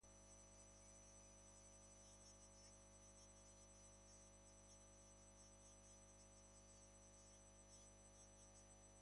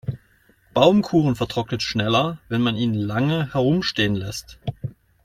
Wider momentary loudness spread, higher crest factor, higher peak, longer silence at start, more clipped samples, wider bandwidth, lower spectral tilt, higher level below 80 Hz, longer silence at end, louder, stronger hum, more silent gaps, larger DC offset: second, 2 LU vs 15 LU; second, 14 dB vs 20 dB; second, -54 dBFS vs -2 dBFS; about the same, 0 s vs 0.05 s; neither; second, 11 kHz vs 15.5 kHz; second, -3 dB/octave vs -6 dB/octave; second, -74 dBFS vs -50 dBFS; second, 0 s vs 0.3 s; second, -65 LUFS vs -21 LUFS; first, 50 Hz at -70 dBFS vs none; neither; neither